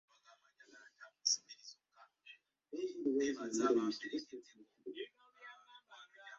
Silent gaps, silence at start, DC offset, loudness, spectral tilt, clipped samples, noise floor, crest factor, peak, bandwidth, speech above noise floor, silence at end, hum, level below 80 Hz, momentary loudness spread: none; 0.3 s; under 0.1%; -38 LUFS; -2 dB/octave; under 0.1%; -69 dBFS; 24 dB; -20 dBFS; 7.4 kHz; 30 dB; 0 s; none; -86 dBFS; 24 LU